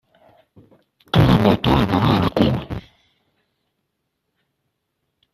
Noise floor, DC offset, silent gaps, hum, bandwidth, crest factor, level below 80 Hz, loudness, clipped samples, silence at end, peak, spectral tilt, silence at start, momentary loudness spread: -75 dBFS; under 0.1%; none; none; 14 kHz; 20 dB; -38 dBFS; -17 LUFS; under 0.1%; 2.55 s; -2 dBFS; -7.5 dB/octave; 1.15 s; 12 LU